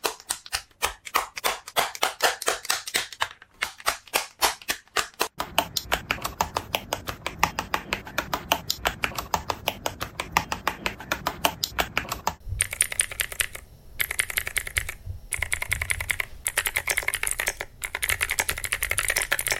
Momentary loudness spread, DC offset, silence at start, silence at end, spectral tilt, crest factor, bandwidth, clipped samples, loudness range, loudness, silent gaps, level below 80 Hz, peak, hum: 8 LU; under 0.1%; 0.05 s; 0 s; -1 dB/octave; 26 dB; 17 kHz; under 0.1%; 2 LU; -27 LUFS; none; -44 dBFS; -2 dBFS; none